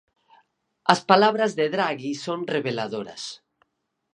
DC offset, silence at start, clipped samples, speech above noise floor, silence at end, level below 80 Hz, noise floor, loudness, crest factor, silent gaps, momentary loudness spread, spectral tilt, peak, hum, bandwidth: under 0.1%; 0.85 s; under 0.1%; 50 dB; 0.75 s; -74 dBFS; -73 dBFS; -23 LUFS; 24 dB; none; 15 LU; -4.5 dB/octave; 0 dBFS; none; 11 kHz